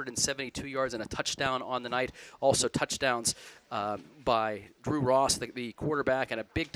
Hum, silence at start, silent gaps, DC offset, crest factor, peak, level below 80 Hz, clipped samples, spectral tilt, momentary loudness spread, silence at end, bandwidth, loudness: none; 0 s; none; under 0.1%; 20 dB; -10 dBFS; -56 dBFS; under 0.1%; -3 dB/octave; 9 LU; 0.05 s; 16 kHz; -31 LUFS